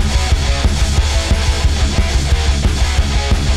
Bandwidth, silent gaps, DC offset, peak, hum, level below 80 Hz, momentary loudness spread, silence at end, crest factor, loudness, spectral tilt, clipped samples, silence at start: 13 kHz; none; under 0.1%; -2 dBFS; none; -14 dBFS; 1 LU; 0 s; 10 dB; -16 LUFS; -4.5 dB/octave; under 0.1%; 0 s